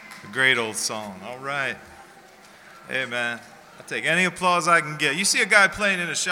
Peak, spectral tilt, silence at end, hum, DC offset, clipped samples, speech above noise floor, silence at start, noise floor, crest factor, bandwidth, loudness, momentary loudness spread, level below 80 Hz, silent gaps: -2 dBFS; -2 dB/octave; 0 s; none; under 0.1%; under 0.1%; 26 dB; 0 s; -49 dBFS; 22 dB; 19.5 kHz; -21 LUFS; 15 LU; -60 dBFS; none